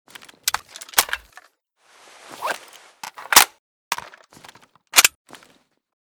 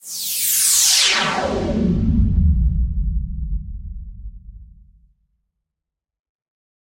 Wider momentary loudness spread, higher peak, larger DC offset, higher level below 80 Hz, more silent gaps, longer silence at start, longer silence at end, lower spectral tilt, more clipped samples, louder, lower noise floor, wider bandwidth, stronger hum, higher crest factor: about the same, 22 LU vs 22 LU; about the same, 0 dBFS vs -2 dBFS; neither; second, -60 dBFS vs -26 dBFS; first, 3.59-3.91 s vs none; first, 0.45 s vs 0.05 s; second, 0.95 s vs 2.25 s; second, 2 dB/octave vs -3 dB/octave; neither; about the same, -19 LUFS vs -17 LUFS; second, -59 dBFS vs -85 dBFS; first, over 20 kHz vs 16.5 kHz; neither; first, 24 dB vs 18 dB